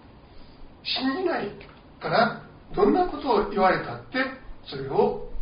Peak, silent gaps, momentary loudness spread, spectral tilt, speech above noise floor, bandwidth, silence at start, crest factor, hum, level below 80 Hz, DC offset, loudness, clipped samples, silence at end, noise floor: -8 dBFS; none; 14 LU; -3 dB/octave; 22 dB; 5.4 kHz; 0.05 s; 18 dB; none; -44 dBFS; under 0.1%; -25 LUFS; under 0.1%; 0 s; -46 dBFS